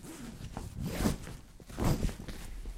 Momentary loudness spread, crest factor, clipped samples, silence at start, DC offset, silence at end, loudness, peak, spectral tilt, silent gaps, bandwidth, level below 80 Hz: 15 LU; 20 dB; under 0.1%; 0 s; under 0.1%; 0 s; -37 LUFS; -16 dBFS; -5.5 dB/octave; none; 16 kHz; -40 dBFS